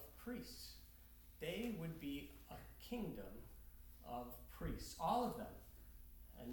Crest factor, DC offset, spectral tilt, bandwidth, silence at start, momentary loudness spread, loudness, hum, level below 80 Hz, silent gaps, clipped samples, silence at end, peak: 22 dB; under 0.1%; -5.5 dB/octave; 19 kHz; 0 s; 20 LU; -48 LUFS; none; -60 dBFS; none; under 0.1%; 0 s; -28 dBFS